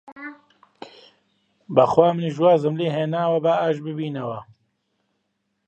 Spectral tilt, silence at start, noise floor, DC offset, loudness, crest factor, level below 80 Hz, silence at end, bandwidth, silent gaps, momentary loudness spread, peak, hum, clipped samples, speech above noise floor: -8 dB/octave; 0.05 s; -74 dBFS; under 0.1%; -21 LUFS; 20 dB; -66 dBFS; 1.25 s; 8.2 kHz; 0.12-0.16 s; 18 LU; -2 dBFS; none; under 0.1%; 54 dB